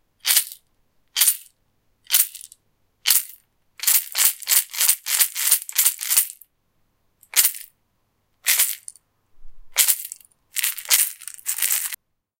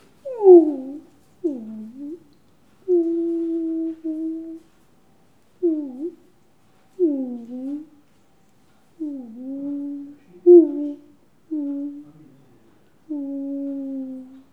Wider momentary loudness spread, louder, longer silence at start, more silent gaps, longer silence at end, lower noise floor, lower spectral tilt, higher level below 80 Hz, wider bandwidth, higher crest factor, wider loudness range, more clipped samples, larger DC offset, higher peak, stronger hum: second, 13 LU vs 24 LU; about the same, -19 LUFS vs -21 LUFS; about the same, 0.25 s vs 0.25 s; neither; first, 0.45 s vs 0.15 s; first, -69 dBFS vs -60 dBFS; second, 5.5 dB/octave vs -9.5 dB/octave; first, -58 dBFS vs -74 dBFS; first, 17.5 kHz vs 1.5 kHz; about the same, 24 dB vs 22 dB; second, 5 LU vs 11 LU; neither; second, under 0.1% vs 0.1%; about the same, 0 dBFS vs 0 dBFS; neither